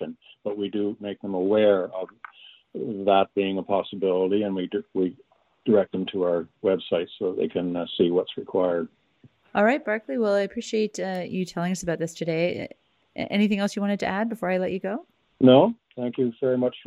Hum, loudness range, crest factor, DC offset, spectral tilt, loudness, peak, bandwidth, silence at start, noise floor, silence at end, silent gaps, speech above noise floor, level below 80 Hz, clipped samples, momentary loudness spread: none; 4 LU; 20 dB; under 0.1%; -6 dB/octave; -25 LUFS; -4 dBFS; 13 kHz; 0 s; -58 dBFS; 0.05 s; none; 34 dB; -64 dBFS; under 0.1%; 12 LU